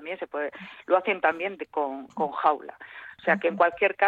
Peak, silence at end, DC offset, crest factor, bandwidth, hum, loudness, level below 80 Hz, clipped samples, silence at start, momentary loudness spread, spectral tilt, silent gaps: -8 dBFS; 0 s; under 0.1%; 18 dB; 7.2 kHz; none; -26 LUFS; -72 dBFS; under 0.1%; 0 s; 15 LU; -6.5 dB/octave; none